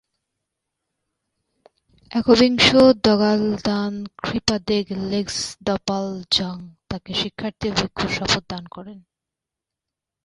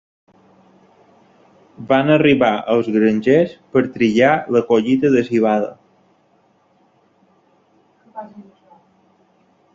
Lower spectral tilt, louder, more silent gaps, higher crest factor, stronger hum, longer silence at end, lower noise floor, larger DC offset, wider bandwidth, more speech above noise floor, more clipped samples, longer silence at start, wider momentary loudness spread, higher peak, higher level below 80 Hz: second, -4.5 dB/octave vs -7 dB/octave; second, -20 LUFS vs -16 LUFS; neither; about the same, 20 dB vs 18 dB; neither; about the same, 1.25 s vs 1.35 s; first, -86 dBFS vs -58 dBFS; neither; first, 11.5 kHz vs 7.6 kHz; first, 66 dB vs 43 dB; neither; first, 2.1 s vs 1.8 s; second, 17 LU vs 22 LU; about the same, -2 dBFS vs -2 dBFS; first, -48 dBFS vs -58 dBFS